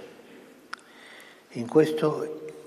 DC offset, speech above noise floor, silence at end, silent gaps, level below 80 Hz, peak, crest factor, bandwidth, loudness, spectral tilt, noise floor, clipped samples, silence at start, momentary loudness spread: under 0.1%; 25 dB; 0 s; none; -80 dBFS; -8 dBFS; 22 dB; 13.5 kHz; -26 LUFS; -6.5 dB/octave; -50 dBFS; under 0.1%; 0 s; 25 LU